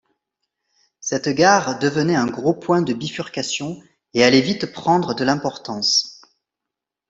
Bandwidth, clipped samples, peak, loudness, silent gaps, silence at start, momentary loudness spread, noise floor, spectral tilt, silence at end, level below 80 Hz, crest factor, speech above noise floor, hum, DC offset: 8.2 kHz; under 0.1%; -2 dBFS; -19 LUFS; none; 1.05 s; 12 LU; -85 dBFS; -4 dB/octave; 0.95 s; -60 dBFS; 18 dB; 66 dB; none; under 0.1%